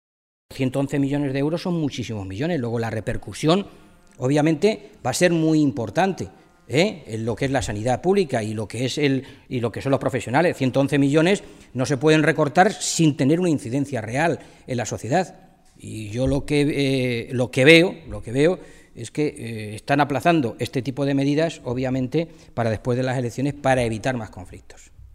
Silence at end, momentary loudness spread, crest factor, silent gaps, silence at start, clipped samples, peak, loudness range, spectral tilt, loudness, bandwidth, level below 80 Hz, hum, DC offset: 0.1 s; 12 LU; 22 dB; none; 0.5 s; under 0.1%; 0 dBFS; 5 LU; -5.5 dB/octave; -22 LUFS; 15.5 kHz; -46 dBFS; none; under 0.1%